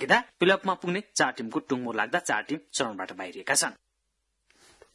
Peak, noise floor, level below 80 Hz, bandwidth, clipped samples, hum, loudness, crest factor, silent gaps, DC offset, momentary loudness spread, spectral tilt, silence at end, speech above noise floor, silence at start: -6 dBFS; -78 dBFS; -74 dBFS; 12 kHz; under 0.1%; none; -27 LUFS; 22 dB; none; under 0.1%; 9 LU; -2.5 dB/octave; 1.2 s; 50 dB; 0 s